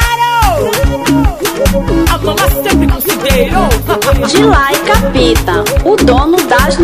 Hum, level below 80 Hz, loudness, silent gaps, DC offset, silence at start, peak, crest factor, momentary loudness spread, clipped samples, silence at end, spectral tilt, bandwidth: none; -16 dBFS; -10 LUFS; none; 0.4%; 0 s; 0 dBFS; 10 dB; 4 LU; 0.3%; 0 s; -5 dB/octave; 16 kHz